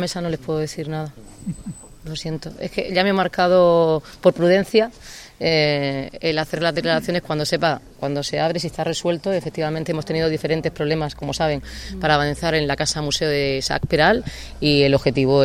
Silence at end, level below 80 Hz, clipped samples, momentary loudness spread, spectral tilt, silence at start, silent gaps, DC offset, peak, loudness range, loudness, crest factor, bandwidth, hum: 0 s; -42 dBFS; under 0.1%; 13 LU; -5 dB/octave; 0 s; none; under 0.1%; 0 dBFS; 4 LU; -20 LUFS; 20 dB; 16 kHz; none